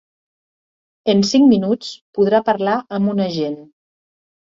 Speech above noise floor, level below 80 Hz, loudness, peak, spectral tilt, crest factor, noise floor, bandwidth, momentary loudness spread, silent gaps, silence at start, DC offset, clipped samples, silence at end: over 74 dB; -60 dBFS; -17 LUFS; -2 dBFS; -6 dB/octave; 16 dB; under -90 dBFS; 7.6 kHz; 12 LU; 2.01-2.13 s; 1.05 s; under 0.1%; under 0.1%; 0.95 s